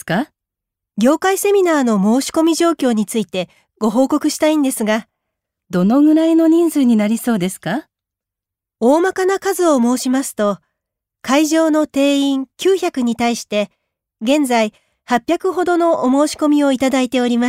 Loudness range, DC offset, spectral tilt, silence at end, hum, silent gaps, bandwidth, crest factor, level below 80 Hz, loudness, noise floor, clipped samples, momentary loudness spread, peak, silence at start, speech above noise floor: 3 LU; under 0.1%; -4.5 dB/octave; 0 s; none; none; 16 kHz; 14 dB; -60 dBFS; -16 LUFS; -85 dBFS; under 0.1%; 8 LU; -2 dBFS; 0.05 s; 70 dB